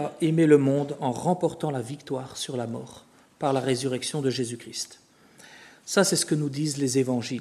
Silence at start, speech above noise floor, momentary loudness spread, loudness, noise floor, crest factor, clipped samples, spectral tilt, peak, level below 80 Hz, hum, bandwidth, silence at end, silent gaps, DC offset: 0 s; 27 dB; 14 LU; -26 LUFS; -53 dBFS; 20 dB; under 0.1%; -5 dB/octave; -6 dBFS; -70 dBFS; none; 13.5 kHz; 0 s; none; under 0.1%